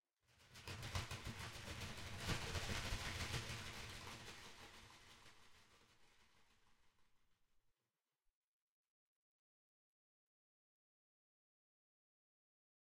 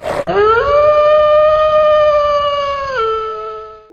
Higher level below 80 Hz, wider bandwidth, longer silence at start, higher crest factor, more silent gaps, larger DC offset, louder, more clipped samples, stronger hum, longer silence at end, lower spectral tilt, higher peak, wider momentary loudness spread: second, -62 dBFS vs -38 dBFS; first, 16 kHz vs 8.6 kHz; first, 0.3 s vs 0 s; first, 24 dB vs 12 dB; neither; neither; second, -49 LUFS vs -12 LUFS; neither; neither; first, 5.7 s vs 0.15 s; second, -3.5 dB/octave vs -5 dB/octave; second, -30 dBFS vs -2 dBFS; first, 18 LU vs 12 LU